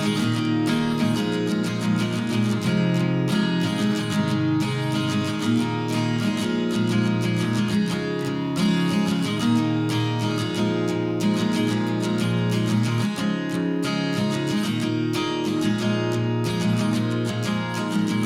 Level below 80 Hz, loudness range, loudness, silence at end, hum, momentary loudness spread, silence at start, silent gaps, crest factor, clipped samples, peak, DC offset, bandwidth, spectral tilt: -58 dBFS; 1 LU; -23 LUFS; 0 s; none; 3 LU; 0 s; none; 12 dB; under 0.1%; -10 dBFS; under 0.1%; 16 kHz; -6 dB/octave